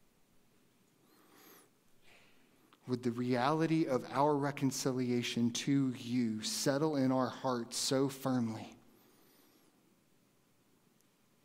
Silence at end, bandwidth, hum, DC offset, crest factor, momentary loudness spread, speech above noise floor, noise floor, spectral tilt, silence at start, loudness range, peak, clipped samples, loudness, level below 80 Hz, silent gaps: 2.7 s; 16 kHz; none; under 0.1%; 20 dB; 6 LU; 38 dB; -71 dBFS; -5 dB/octave; 1.5 s; 9 LU; -16 dBFS; under 0.1%; -34 LUFS; -80 dBFS; none